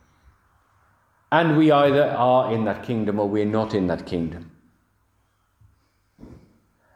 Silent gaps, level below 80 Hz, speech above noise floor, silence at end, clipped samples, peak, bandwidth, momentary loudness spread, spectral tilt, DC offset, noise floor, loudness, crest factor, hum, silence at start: none; -58 dBFS; 46 dB; 0.6 s; under 0.1%; -2 dBFS; 9.4 kHz; 11 LU; -8 dB/octave; under 0.1%; -66 dBFS; -21 LUFS; 20 dB; none; 1.3 s